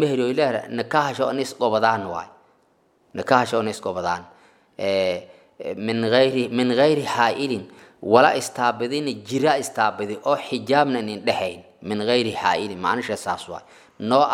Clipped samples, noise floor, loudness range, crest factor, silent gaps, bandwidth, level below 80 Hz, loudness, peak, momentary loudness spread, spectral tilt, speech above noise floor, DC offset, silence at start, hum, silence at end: under 0.1%; -62 dBFS; 5 LU; 22 dB; none; 16.5 kHz; -68 dBFS; -22 LUFS; 0 dBFS; 12 LU; -4.5 dB/octave; 40 dB; under 0.1%; 0 s; none; 0 s